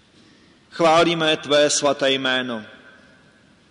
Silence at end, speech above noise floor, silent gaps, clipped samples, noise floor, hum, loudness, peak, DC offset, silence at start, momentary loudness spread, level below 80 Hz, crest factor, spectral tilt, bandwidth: 1 s; 35 dB; none; under 0.1%; -54 dBFS; none; -18 LUFS; -8 dBFS; under 0.1%; 0.75 s; 13 LU; -60 dBFS; 14 dB; -3 dB/octave; 11 kHz